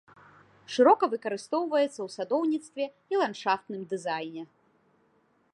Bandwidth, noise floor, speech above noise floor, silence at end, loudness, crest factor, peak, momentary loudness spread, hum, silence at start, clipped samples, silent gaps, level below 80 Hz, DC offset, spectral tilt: 11.5 kHz; -68 dBFS; 40 dB; 1.1 s; -28 LUFS; 20 dB; -10 dBFS; 14 LU; none; 0.7 s; under 0.1%; none; -82 dBFS; under 0.1%; -4.5 dB/octave